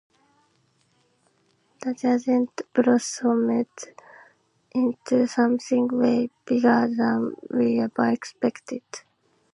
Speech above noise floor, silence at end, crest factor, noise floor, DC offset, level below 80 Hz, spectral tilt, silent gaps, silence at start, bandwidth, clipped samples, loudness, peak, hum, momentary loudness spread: 43 dB; 0.55 s; 18 dB; -66 dBFS; under 0.1%; -72 dBFS; -5 dB/octave; none; 1.8 s; 11 kHz; under 0.1%; -23 LUFS; -6 dBFS; none; 13 LU